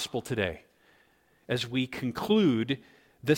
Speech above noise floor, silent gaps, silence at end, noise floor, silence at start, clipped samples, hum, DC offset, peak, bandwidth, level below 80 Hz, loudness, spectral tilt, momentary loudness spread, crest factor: 36 dB; none; 0 s; -65 dBFS; 0 s; under 0.1%; none; under 0.1%; -10 dBFS; 17 kHz; -60 dBFS; -29 LUFS; -5.5 dB/octave; 11 LU; 20 dB